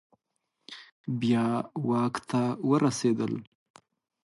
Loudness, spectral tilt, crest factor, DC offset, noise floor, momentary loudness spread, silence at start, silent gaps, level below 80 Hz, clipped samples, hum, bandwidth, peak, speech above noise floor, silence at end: -28 LUFS; -6.5 dB/octave; 18 dB; under 0.1%; -80 dBFS; 17 LU; 0.7 s; 0.92-1.04 s; -70 dBFS; under 0.1%; none; 11.5 kHz; -12 dBFS; 53 dB; 0.8 s